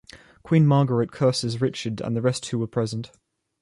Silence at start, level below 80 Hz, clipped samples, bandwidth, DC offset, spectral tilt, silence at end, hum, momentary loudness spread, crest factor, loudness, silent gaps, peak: 0.15 s; -58 dBFS; under 0.1%; 11.5 kHz; under 0.1%; -6.5 dB/octave; 0.55 s; none; 11 LU; 16 dB; -23 LUFS; none; -8 dBFS